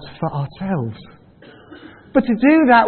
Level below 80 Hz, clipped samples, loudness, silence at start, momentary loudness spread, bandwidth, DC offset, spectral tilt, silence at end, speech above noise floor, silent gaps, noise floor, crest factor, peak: -52 dBFS; under 0.1%; -18 LUFS; 0 s; 14 LU; 4.4 kHz; under 0.1%; -12 dB/octave; 0 s; 29 dB; none; -45 dBFS; 18 dB; 0 dBFS